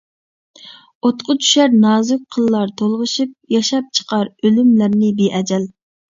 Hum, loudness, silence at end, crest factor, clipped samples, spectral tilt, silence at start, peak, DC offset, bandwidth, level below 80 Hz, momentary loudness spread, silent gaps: none; -15 LUFS; 0.45 s; 14 dB; under 0.1%; -4.5 dB/octave; 0.65 s; -2 dBFS; under 0.1%; 7.8 kHz; -62 dBFS; 8 LU; 0.95-1.01 s